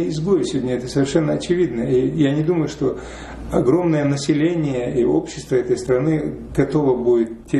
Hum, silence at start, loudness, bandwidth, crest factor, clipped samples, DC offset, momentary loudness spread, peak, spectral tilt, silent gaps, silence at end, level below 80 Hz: none; 0 s; -19 LUFS; 11.5 kHz; 14 dB; under 0.1%; under 0.1%; 6 LU; -4 dBFS; -7 dB/octave; none; 0 s; -42 dBFS